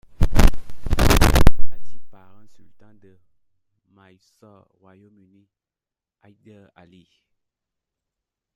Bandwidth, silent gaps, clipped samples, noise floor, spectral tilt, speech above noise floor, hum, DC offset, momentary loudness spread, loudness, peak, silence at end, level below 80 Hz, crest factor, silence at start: 16 kHz; none; 0.2%; -89 dBFS; -5 dB/octave; 39 dB; none; under 0.1%; 23 LU; -19 LUFS; 0 dBFS; 6.4 s; -26 dBFS; 18 dB; 0.2 s